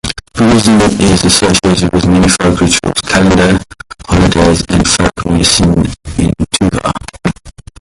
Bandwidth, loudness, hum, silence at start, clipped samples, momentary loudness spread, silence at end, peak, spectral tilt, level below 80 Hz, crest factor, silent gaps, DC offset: 12 kHz; -10 LUFS; none; 0.05 s; under 0.1%; 10 LU; 0.3 s; 0 dBFS; -4.5 dB/octave; -24 dBFS; 10 dB; none; under 0.1%